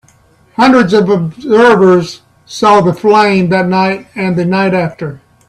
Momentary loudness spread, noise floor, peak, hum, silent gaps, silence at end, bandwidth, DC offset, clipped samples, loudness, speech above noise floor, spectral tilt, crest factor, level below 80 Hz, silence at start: 13 LU; -47 dBFS; 0 dBFS; none; none; 0.3 s; 11.5 kHz; under 0.1%; under 0.1%; -10 LUFS; 38 dB; -6.5 dB/octave; 10 dB; -48 dBFS; 0.6 s